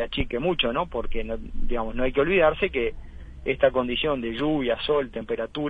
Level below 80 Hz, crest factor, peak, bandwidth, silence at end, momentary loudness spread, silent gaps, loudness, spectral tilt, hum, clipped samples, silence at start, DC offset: -34 dBFS; 18 dB; -6 dBFS; 4.8 kHz; 0 s; 11 LU; none; -25 LUFS; -7.5 dB/octave; none; under 0.1%; 0 s; 0.2%